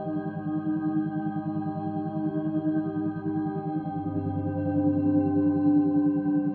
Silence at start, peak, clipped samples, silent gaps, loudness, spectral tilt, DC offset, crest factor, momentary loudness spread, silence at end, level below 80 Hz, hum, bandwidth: 0 s; -12 dBFS; under 0.1%; none; -27 LUFS; -13 dB/octave; under 0.1%; 14 dB; 8 LU; 0 s; -64 dBFS; none; 3.4 kHz